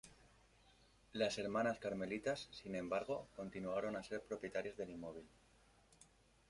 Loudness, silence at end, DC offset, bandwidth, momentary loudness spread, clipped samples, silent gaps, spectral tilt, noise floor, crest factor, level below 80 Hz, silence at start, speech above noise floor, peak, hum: -44 LUFS; 0.45 s; under 0.1%; 11.5 kHz; 12 LU; under 0.1%; none; -5 dB/octave; -71 dBFS; 20 dB; -72 dBFS; 0.05 s; 27 dB; -26 dBFS; none